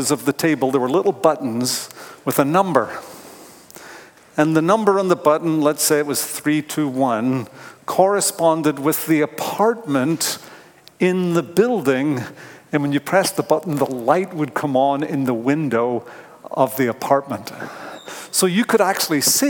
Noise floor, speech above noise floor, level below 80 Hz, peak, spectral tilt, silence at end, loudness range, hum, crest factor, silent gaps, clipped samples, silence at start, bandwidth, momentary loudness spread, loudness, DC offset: -42 dBFS; 24 dB; -68 dBFS; 0 dBFS; -4.5 dB/octave; 0 s; 3 LU; none; 18 dB; none; under 0.1%; 0 s; 18 kHz; 15 LU; -19 LUFS; under 0.1%